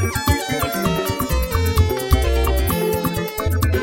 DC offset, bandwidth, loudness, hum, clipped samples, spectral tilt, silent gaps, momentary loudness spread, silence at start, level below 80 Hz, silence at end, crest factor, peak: under 0.1%; 17 kHz; -20 LUFS; none; under 0.1%; -5 dB/octave; none; 3 LU; 0 s; -24 dBFS; 0 s; 16 dB; -2 dBFS